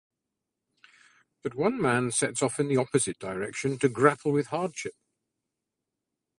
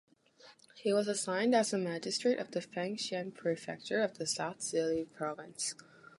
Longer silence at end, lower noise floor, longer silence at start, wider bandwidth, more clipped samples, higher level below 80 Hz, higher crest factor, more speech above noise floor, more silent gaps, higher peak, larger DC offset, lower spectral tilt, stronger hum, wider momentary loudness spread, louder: first, 1.45 s vs 0.1 s; first, -86 dBFS vs -61 dBFS; first, 1.45 s vs 0.45 s; about the same, 11.5 kHz vs 11.5 kHz; neither; first, -68 dBFS vs -78 dBFS; first, 24 dB vs 18 dB; first, 59 dB vs 27 dB; neither; first, -6 dBFS vs -16 dBFS; neither; about the same, -4.5 dB/octave vs -3.5 dB/octave; neither; first, 12 LU vs 9 LU; first, -27 LUFS vs -35 LUFS